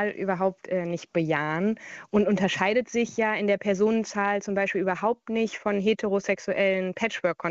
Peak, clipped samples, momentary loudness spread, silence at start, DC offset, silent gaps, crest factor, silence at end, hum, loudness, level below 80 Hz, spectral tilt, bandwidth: -10 dBFS; under 0.1%; 5 LU; 0 s; under 0.1%; none; 16 dB; 0 s; none; -26 LUFS; -64 dBFS; -5.5 dB/octave; 7.8 kHz